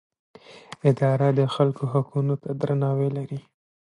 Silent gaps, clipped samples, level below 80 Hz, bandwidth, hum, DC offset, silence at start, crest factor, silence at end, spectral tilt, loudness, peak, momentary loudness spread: none; under 0.1%; -68 dBFS; 10 kHz; none; under 0.1%; 0.5 s; 18 dB; 0.45 s; -8.5 dB/octave; -24 LUFS; -6 dBFS; 11 LU